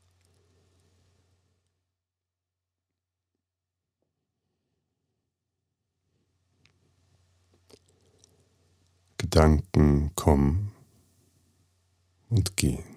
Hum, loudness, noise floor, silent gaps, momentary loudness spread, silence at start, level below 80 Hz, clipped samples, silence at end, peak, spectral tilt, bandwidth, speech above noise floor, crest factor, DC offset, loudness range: none; -25 LUFS; -89 dBFS; none; 13 LU; 9.2 s; -38 dBFS; under 0.1%; 0.15 s; -4 dBFS; -6.5 dB/octave; 15 kHz; 66 dB; 28 dB; under 0.1%; 4 LU